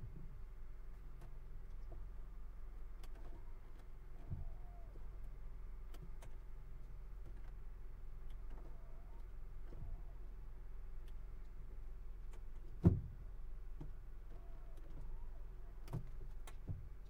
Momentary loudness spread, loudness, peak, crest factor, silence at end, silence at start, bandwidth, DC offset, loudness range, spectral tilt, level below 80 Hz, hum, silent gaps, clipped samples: 7 LU; -51 LUFS; -18 dBFS; 28 dB; 0 s; 0 s; 8 kHz; under 0.1%; 12 LU; -9 dB/octave; -50 dBFS; none; none; under 0.1%